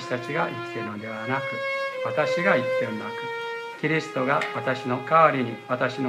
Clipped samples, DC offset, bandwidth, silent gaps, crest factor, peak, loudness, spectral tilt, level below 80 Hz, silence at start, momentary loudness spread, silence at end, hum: under 0.1%; under 0.1%; 14 kHz; none; 20 dB; -4 dBFS; -25 LUFS; -6 dB/octave; -74 dBFS; 0 s; 11 LU; 0 s; none